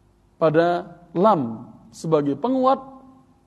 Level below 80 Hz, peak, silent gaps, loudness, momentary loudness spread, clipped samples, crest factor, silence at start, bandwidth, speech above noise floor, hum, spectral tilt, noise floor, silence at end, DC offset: -64 dBFS; -4 dBFS; none; -21 LUFS; 12 LU; under 0.1%; 18 dB; 0.4 s; 11.5 kHz; 30 dB; none; -7.5 dB/octave; -50 dBFS; 0.5 s; under 0.1%